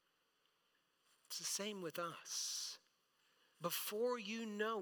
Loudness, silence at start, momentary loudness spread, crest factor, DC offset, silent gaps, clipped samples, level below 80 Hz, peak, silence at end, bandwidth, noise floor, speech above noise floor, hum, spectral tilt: -43 LUFS; 1.3 s; 7 LU; 20 dB; under 0.1%; none; under 0.1%; under -90 dBFS; -28 dBFS; 0 s; 19 kHz; -81 dBFS; 38 dB; none; -2 dB/octave